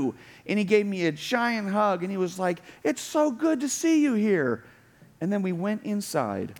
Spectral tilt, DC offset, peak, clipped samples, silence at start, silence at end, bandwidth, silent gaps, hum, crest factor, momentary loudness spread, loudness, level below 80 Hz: -5 dB/octave; under 0.1%; -8 dBFS; under 0.1%; 0 s; 0.05 s; 19 kHz; none; none; 18 dB; 7 LU; -26 LUFS; -72 dBFS